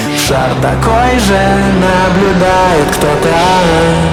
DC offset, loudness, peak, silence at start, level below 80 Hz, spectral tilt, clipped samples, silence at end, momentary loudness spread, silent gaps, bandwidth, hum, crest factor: under 0.1%; -9 LUFS; 0 dBFS; 0 s; -24 dBFS; -5 dB/octave; under 0.1%; 0 s; 3 LU; none; 17 kHz; none; 8 dB